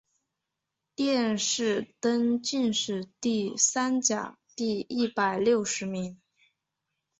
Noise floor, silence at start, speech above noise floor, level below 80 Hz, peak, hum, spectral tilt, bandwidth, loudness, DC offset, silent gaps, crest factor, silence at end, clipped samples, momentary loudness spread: -85 dBFS; 1 s; 58 dB; -70 dBFS; -10 dBFS; none; -3 dB/octave; 8.4 kHz; -27 LUFS; under 0.1%; none; 20 dB; 1.05 s; under 0.1%; 9 LU